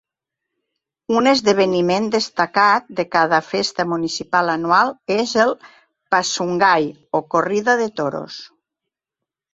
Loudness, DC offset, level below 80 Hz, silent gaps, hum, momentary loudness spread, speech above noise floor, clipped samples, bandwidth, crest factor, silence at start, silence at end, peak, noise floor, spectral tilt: -18 LUFS; under 0.1%; -62 dBFS; none; none; 7 LU; 67 dB; under 0.1%; 8 kHz; 18 dB; 1.1 s; 1.05 s; 0 dBFS; -85 dBFS; -4 dB/octave